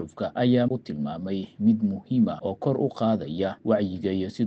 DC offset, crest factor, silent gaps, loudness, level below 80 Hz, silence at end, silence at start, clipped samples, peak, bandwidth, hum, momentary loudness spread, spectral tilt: under 0.1%; 16 dB; none; -26 LUFS; -64 dBFS; 0 s; 0 s; under 0.1%; -8 dBFS; 7.8 kHz; none; 8 LU; -9 dB/octave